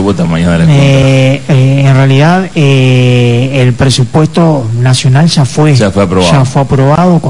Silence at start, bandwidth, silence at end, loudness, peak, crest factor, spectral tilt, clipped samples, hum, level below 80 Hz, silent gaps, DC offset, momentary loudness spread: 0 s; 11 kHz; 0 s; -7 LUFS; 0 dBFS; 6 dB; -6.5 dB/octave; 3%; none; -34 dBFS; none; 4%; 3 LU